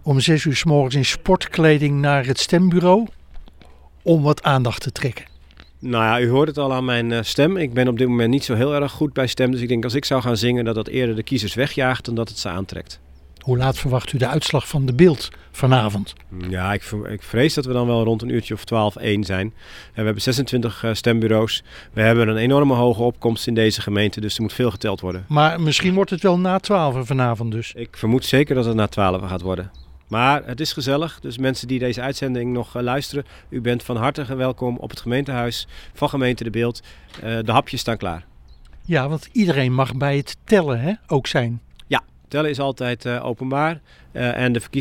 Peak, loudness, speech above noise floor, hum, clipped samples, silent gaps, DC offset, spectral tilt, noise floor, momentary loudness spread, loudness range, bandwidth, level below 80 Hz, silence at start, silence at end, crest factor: 0 dBFS; -20 LUFS; 26 dB; none; under 0.1%; none; under 0.1%; -6 dB/octave; -45 dBFS; 10 LU; 5 LU; 17 kHz; -44 dBFS; 0 s; 0 s; 18 dB